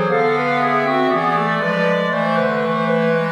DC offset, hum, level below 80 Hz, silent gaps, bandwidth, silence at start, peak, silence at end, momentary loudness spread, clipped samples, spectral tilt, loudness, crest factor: under 0.1%; none; -64 dBFS; none; 11 kHz; 0 s; -6 dBFS; 0 s; 1 LU; under 0.1%; -7 dB/octave; -17 LUFS; 12 dB